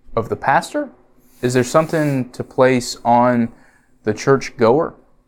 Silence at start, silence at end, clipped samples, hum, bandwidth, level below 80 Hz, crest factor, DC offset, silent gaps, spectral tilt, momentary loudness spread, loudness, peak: 0.1 s; 0.35 s; under 0.1%; none; 18 kHz; -46 dBFS; 18 dB; under 0.1%; none; -5.5 dB/octave; 10 LU; -18 LUFS; 0 dBFS